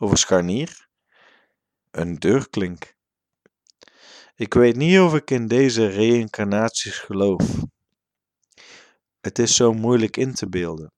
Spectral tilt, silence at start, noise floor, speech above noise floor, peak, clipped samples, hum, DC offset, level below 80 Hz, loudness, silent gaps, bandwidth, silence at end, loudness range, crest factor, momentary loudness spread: -4.5 dB/octave; 0 s; -85 dBFS; 66 dB; -2 dBFS; under 0.1%; none; under 0.1%; -50 dBFS; -20 LUFS; none; 11.5 kHz; 0.1 s; 9 LU; 18 dB; 14 LU